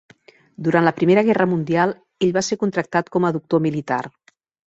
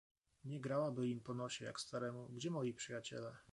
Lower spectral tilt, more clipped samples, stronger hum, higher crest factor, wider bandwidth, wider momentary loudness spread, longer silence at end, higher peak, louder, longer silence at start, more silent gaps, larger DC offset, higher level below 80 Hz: about the same, -6 dB/octave vs -5 dB/octave; neither; neither; about the same, 18 dB vs 16 dB; second, 8 kHz vs 11.5 kHz; about the same, 9 LU vs 8 LU; first, 0.55 s vs 0.1 s; first, -2 dBFS vs -28 dBFS; first, -20 LUFS vs -45 LUFS; first, 0.6 s vs 0.45 s; neither; neither; first, -60 dBFS vs -80 dBFS